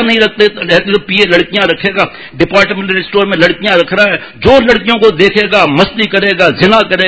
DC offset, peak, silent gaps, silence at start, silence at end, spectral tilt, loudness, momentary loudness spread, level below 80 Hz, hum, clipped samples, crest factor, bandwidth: 0.5%; 0 dBFS; none; 0 s; 0 s; -5.5 dB/octave; -9 LUFS; 4 LU; -36 dBFS; none; 2%; 10 dB; 8 kHz